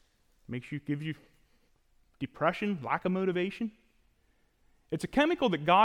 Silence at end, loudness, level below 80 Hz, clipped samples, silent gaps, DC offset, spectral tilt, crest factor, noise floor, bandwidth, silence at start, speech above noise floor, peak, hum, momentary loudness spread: 0 s; -32 LUFS; -62 dBFS; under 0.1%; none; under 0.1%; -6.5 dB/octave; 20 dB; -69 dBFS; 14.5 kHz; 0.5 s; 40 dB; -12 dBFS; none; 15 LU